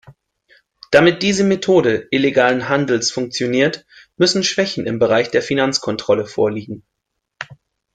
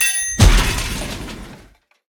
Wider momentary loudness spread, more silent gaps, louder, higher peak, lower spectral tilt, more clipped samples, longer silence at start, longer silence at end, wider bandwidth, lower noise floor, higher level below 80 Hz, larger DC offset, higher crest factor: about the same, 17 LU vs 18 LU; neither; about the same, -16 LUFS vs -17 LUFS; about the same, 0 dBFS vs 0 dBFS; about the same, -4 dB/octave vs -3 dB/octave; neither; about the same, 0.1 s vs 0 s; second, 0.4 s vs 0.55 s; second, 9.4 kHz vs over 20 kHz; first, -56 dBFS vs -49 dBFS; second, -56 dBFS vs -20 dBFS; neither; about the same, 18 dB vs 18 dB